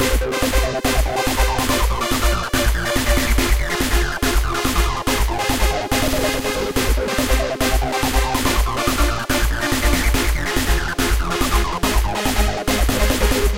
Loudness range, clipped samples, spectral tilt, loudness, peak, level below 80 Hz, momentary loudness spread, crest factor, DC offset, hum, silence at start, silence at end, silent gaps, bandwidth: 1 LU; under 0.1%; -4 dB/octave; -19 LUFS; -4 dBFS; -22 dBFS; 2 LU; 14 dB; 2%; none; 0 s; 0 s; none; 17 kHz